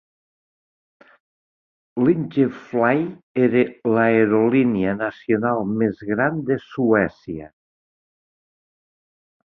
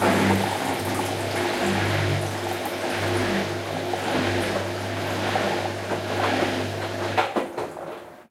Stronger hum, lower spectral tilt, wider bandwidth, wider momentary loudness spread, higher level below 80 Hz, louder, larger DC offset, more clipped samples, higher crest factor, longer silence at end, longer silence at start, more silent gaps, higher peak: neither; first, -10 dB/octave vs -5 dB/octave; second, 5.8 kHz vs 16 kHz; first, 9 LU vs 5 LU; about the same, -58 dBFS vs -54 dBFS; first, -20 LUFS vs -25 LUFS; neither; neither; about the same, 18 dB vs 18 dB; first, 2 s vs 0.05 s; first, 1.95 s vs 0 s; first, 3.23-3.35 s vs none; about the same, -4 dBFS vs -6 dBFS